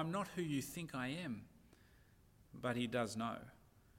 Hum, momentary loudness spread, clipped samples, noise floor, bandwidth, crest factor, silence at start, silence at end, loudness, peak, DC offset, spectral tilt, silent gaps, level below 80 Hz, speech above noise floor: none; 15 LU; under 0.1%; -68 dBFS; 16.5 kHz; 18 dB; 0 s; 0 s; -43 LUFS; -26 dBFS; under 0.1%; -5 dB/octave; none; -70 dBFS; 26 dB